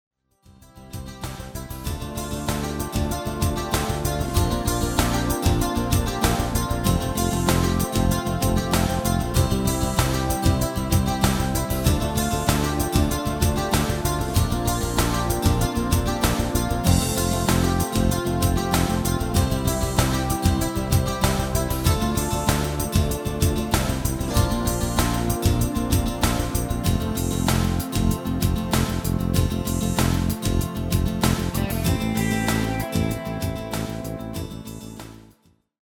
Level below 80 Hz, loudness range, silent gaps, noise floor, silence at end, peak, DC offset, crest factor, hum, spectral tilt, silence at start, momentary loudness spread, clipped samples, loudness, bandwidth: -30 dBFS; 3 LU; none; -59 dBFS; 0.6 s; -4 dBFS; under 0.1%; 18 dB; none; -5 dB/octave; 0.75 s; 6 LU; under 0.1%; -23 LUFS; over 20 kHz